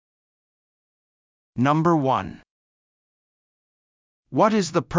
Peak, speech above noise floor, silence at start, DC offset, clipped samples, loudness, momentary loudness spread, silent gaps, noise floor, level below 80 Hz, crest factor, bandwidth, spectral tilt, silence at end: -6 dBFS; over 70 dB; 1.55 s; under 0.1%; under 0.1%; -21 LUFS; 13 LU; 2.50-4.23 s; under -90 dBFS; -56 dBFS; 20 dB; 7.6 kHz; -6.5 dB/octave; 0 s